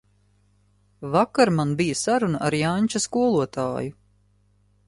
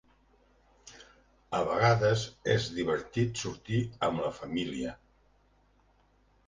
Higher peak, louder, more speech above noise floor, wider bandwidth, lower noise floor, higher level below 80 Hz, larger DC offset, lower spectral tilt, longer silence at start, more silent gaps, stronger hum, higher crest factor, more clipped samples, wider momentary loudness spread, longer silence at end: first, -4 dBFS vs -12 dBFS; first, -23 LUFS vs -31 LUFS; about the same, 40 dB vs 37 dB; first, 11.5 kHz vs 9.8 kHz; second, -62 dBFS vs -66 dBFS; about the same, -58 dBFS vs -58 dBFS; neither; about the same, -5 dB/octave vs -5.5 dB/octave; first, 1 s vs 0.85 s; neither; first, 50 Hz at -50 dBFS vs none; about the same, 20 dB vs 20 dB; neither; second, 8 LU vs 13 LU; second, 0.95 s vs 1.5 s